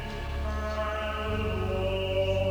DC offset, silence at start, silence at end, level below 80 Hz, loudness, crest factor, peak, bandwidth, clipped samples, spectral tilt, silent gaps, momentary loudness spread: under 0.1%; 0 s; 0 s; -36 dBFS; -30 LUFS; 14 dB; -16 dBFS; over 20 kHz; under 0.1%; -6.5 dB/octave; none; 6 LU